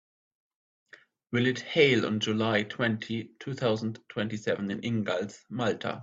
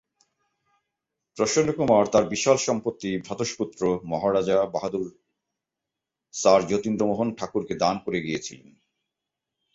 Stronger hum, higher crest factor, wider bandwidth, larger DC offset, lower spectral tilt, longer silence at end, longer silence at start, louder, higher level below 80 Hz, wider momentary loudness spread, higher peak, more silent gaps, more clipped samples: neither; about the same, 22 dB vs 20 dB; about the same, 7.8 kHz vs 8 kHz; neither; about the same, -5.5 dB/octave vs -4.5 dB/octave; second, 0 s vs 1.2 s; about the same, 1.3 s vs 1.35 s; second, -29 LUFS vs -24 LUFS; second, -68 dBFS vs -60 dBFS; about the same, 11 LU vs 11 LU; second, -8 dBFS vs -4 dBFS; neither; neither